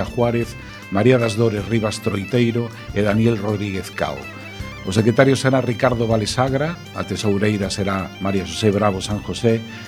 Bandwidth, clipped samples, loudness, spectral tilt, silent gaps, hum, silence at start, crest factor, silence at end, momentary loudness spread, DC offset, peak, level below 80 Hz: 19 kHz; under 0.1%; -20 LUFS; -6 dB/octave; none; none; 0 s; 20 dB; 0 s; 10 LU; under 0.1%; 0 dBFS; -42 dBFS